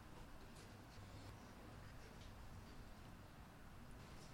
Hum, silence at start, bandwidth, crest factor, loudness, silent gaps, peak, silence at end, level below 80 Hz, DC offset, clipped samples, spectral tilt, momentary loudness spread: none; 0 s; 16.5 kHz; 12 dB; -60 LUFS; none; -46 dBFS; 0 s; -62 dBFS; under 0.1%; under 0.1%; -5 dB/octave; 3 LU